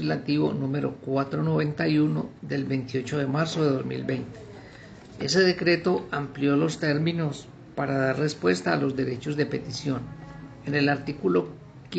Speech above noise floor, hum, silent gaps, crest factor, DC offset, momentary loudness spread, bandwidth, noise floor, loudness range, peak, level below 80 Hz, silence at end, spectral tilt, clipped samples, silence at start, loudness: 20 dB; none; none; 18 dB; under 0.1%; 16 LU; 9 kHz; -45 dBFS; 2 LU; -8 dBFS; -58 dBFS; 0 s; -6 dB/octave; under 0.1%; 0 s; -26 LUFS